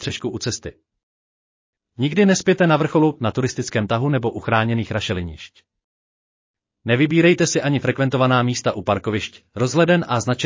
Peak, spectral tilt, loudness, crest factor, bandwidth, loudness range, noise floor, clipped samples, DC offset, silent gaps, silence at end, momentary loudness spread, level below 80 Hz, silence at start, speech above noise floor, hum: -4 dBFS; -5.5 dB/octave; -19 LUFS; 16 dB; 7.6 kHz; 5 LU; under -90 dBFS; under 0.1%; under 0.1%; 1.03-1.73 s, 5.84-6.54 s; 0 s; 10 LU; -48 dBFS; 0 s; over 71 dB; none